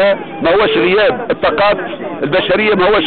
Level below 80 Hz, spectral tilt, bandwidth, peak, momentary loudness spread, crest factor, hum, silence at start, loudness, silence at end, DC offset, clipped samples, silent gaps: -40 dBFS; -9.5 dB/octave; 4.7 kHz; -4 dBFS; 6 LU; 8 dB; none; 0 s; -13 LUFS; 0 s; under 0.1%; under 0.1%; none